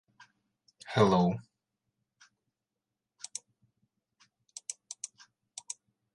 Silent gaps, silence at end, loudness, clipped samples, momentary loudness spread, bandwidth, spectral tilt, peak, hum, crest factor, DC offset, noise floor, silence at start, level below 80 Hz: none; 1.1 s; -33 LUFS; under 0.1%; 23 LU; 11.5 kHz; -5.5 dB/octave; -12 dBFS; none; 24 dB; under 0.1%; -88 dBFS; 0.85 s; -66 dBFS